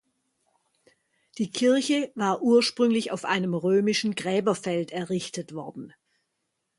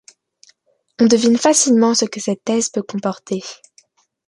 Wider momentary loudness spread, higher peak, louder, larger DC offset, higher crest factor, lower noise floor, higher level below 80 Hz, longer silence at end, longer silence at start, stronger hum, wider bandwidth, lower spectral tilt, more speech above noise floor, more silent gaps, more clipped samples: about the same, 13 LU vs 13 LU; second, -10 dBFS vs -2 dBFS; second, -25 LUFS vs -16 LUFS; neither; about the same, 18 dB vs 16 dB; first, -79 dBFS vs -58 dBFS; second, -72 dBFS vs -64 dBFS; first, 0.9 s vs 0.75 s; first, 1.35 s vs 1 s; neither; about the same, 11.5 kHz vs 11.5 kHz; first, -5 dB/octave vs -3.5 dB/octave; first, 54 dB vs 42 dB; neither; neither